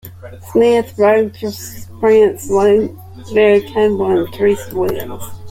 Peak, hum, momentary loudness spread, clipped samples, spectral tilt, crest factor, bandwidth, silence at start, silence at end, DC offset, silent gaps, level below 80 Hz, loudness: -2 dBFS; none; 17 LU; under 0.1%; -5.5 dB/octave; 14 dB; 16.5 kHz; 0.05 s; 0 s; under 0.1%; none; -46 dBFS; -14 LUFS